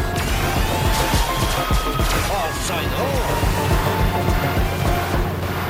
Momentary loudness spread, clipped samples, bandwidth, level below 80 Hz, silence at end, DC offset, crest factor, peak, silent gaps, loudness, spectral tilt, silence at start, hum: 3 LU; under 0.1%; 16.5 kHz; -26 dBFS; 0 s; under 0.1%; 14 dB; -6 dBFS; none; -20 LUFS; -4.5 dB/octave; 0 s; none